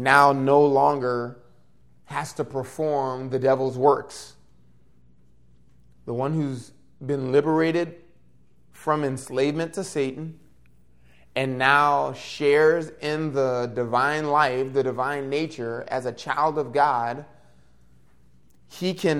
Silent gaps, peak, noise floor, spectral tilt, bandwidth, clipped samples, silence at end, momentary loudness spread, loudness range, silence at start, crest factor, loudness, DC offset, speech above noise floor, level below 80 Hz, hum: none; -2 dBFS; -60 dBFS; -5.5 dB/octave; 14 kHz; under 0.1%; 0 s; 14 LU; 6 LU; 0 s; 22 dB; -23 LUFS; 0.2%; 37 dB; -62 dBFS; none